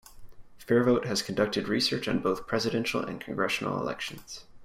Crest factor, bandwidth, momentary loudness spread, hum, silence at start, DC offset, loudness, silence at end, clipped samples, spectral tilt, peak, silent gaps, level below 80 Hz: 18 dB; 16 kHz; 10 LU; none; 0.1 s; under 0.1%; -28 LUFS; 0 s; under 0.1%; -4.5 dB/octave; -12 dBFS; none; -58 dBFS